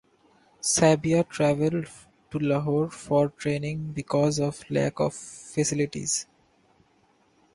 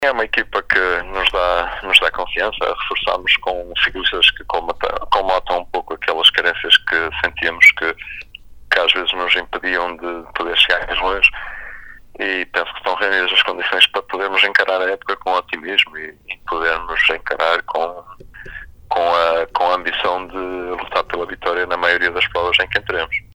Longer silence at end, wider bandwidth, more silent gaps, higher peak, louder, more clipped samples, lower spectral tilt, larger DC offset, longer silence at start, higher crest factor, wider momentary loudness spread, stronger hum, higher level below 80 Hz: first, 1.3 s vs 0.1 s; second, 11.5 kHz vs over 20 kHz; neither; second, -8 dBFS vs 0 dBFS; second, -26 LUFS vs -16 LUFS; neither; first, -5 dB/octave vs -2 dB/octave; neither; first, 0.65 s vs 0 s; about the same, 20 dB vs 18 dB; about the same, 12 LU vs 13 LU; neither; second, -58 dBFS vs -42 dBFS